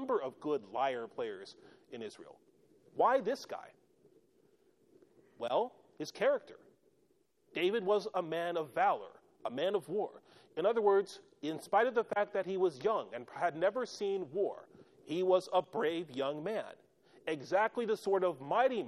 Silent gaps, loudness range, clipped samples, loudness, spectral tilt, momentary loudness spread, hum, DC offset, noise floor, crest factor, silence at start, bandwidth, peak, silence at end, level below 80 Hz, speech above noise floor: none; 6 LU; under 0.1%; -35 LUFS; -5 dB/octave; 15 LU; none; under 0.1%; -74 dBFS; 18 dB; 0 s; 13 kHz; -18 dBFS; 0 s; -84 dBFS; 40 dB